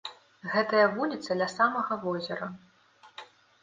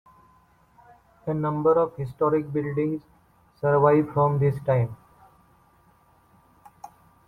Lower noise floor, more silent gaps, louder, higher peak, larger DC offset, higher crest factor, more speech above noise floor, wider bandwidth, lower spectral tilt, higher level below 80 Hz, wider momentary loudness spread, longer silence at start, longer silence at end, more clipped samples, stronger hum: about the same, -59 dBFS vs -60 dBFS; neither; second, -28 LUFS vs -24 LUFS; second, -10 dBFS vs -6 dBFS; neither; about the same, 22 dB vs 20 dB; second, 31 dB vs 37 dB; first, 9.6 kHz vs 4.2 kHz; second, -5 dB/octave vs -10.5 dB/octave; second, -76 dBFS vs -58 dBFS; first, 23 LU vs 10 LU; second, 0.05 s vs 1.25 s; about the same, 0.35 s vs 0.4 s; neither; neither